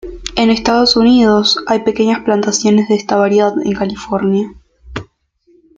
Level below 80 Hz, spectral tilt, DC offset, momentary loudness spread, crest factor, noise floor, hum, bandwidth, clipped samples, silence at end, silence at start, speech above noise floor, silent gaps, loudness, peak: -40 dBFS; -4.5 dB/octave; under 0.1%; 13 LU; 12 dB; -54 dBFS; none; 7.8 kHz; under 0.1%; 0.75 s; 0.05 s; 42 dB; none; -13 LUFS; 0 dBFS